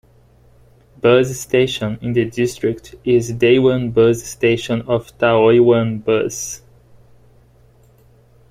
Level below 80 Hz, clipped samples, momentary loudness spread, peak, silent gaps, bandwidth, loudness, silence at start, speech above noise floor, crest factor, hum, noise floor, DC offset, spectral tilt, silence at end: -48 dBFS; under 0.1%; 10 LU; -2 dBFS; none; 15.5 kHz; -16 LUFS; 1.05 s; 35 dB; 16 dB; 60 Hz at -40 dBFS; -50 dBFS; under 0.1%; -5.5 dB/octave; 1.95 s